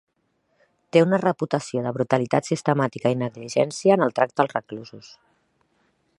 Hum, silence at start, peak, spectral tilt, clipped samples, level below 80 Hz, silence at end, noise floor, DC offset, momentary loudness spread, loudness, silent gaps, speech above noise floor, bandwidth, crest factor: none; 0.95 s; -2 dBFS; -6 dB/octave; under 0.1%; -68 dBFS; 1.2 s; -70 dBFS; under 0.1%; 9 LU; -22 LUFS; none; 48 dB; 11.5 kHz; 22 dB